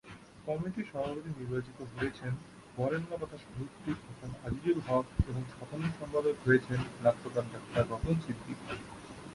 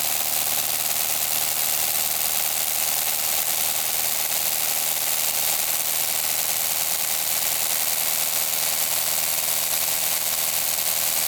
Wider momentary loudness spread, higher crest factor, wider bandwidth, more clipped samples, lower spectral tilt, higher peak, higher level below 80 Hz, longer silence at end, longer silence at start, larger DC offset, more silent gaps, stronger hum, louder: first, 13 LU vs 1 LU; about the same, 20 dB vs 18 dB; second, 11.5 kHz vs over 20 kHz; neither; first, -7.5 dB/octave vs 1 dB/octave; second, -14 dBFS vs -6 dBFS; first, -50 dBFS vs -62 dBFS; about the same, 0 s vs 0 s; about the same, 0.05 s vs 0 s; neither; neither; neither; second, -35 LUFS vs -20 LUFS